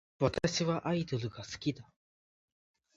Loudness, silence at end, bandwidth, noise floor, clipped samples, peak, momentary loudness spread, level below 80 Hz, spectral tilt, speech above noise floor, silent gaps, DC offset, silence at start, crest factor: -34 LUFS; 1.15 s; 8.8 kHz; under -90 dBFS; under 0.1%; -14 dBFS; 8 LU; -60 dBFS; -5.5 dB/octave; over 56 dB; none; under 0.1%; 0.2 s; 22 dB